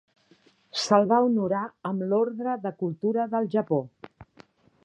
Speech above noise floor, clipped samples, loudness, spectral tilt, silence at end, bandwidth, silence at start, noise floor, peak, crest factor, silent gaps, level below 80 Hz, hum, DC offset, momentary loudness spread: 36 dB; under 0.1%; -26 LUFS; -6 dB/octave; 0.6 s; 10.5 kHz; 0.75 s; -61 dBFS; -6 dBFS; 22 dB; none; -70 dBFS; none; under 0.1%; 10 LU